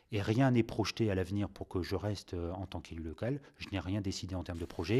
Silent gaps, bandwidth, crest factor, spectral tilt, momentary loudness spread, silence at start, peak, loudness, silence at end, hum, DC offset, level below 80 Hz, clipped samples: none; 13.5 kHz; 18 dB; -6.5 dB/octave; 12 LU; 0.1 s; -16 dBFS; -36 LUFS; 0 s; none; under 0.1%; -54 dBFS; under 0.1%